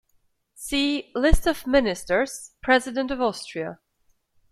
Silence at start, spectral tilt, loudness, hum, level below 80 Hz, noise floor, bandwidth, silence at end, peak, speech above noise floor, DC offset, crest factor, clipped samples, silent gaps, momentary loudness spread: 0.6 s; -4.5 dB/octave; -24 LUFS; none; -34 dBFS; -67 dBFS; 15 kHz; 0.75 s; -2 dBFS; 44 dB; under 0.1%; 22 dB; under 0.1%; none; 11 LU